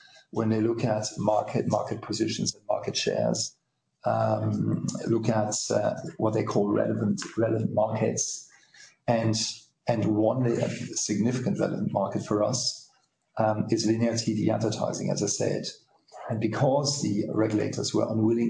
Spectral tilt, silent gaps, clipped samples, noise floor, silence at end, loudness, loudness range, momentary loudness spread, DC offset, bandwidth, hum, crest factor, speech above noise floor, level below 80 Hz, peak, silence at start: -5 dB/octave; none; under 0.1%; -67 dBFS; 0 s; -27 LUFS; 1 LU; 6 LU; under 0.1%; 10.5 kHz; none; 18 dB; 40 dB; -66 dBFS; -10 dBFS; 0.35 s